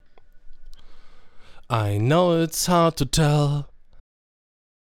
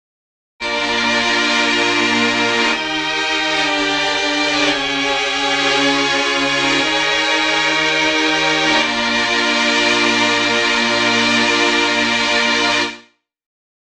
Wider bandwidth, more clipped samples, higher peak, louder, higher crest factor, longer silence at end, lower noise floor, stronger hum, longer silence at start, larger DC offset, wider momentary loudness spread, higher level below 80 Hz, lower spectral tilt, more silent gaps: first, 17.5 kHz vs 11.5 kHz; neither; about the same, -4 dBFS vs -2 dBFS; second, -21 LUFS vs -14 LUFS; about the same, 20 dB vs 16 dB; about the same, 1 s vs 0.9 s; second, -41 dBFS vs -47 dBFS; neither; second, 0.15 s vs 0.6 s; neither; first, 8 LU vs 3 LU; first, -42 dBFS vs -48 dBFS; first, -5.5 dB/octave vs -1.5 dB/octave; neither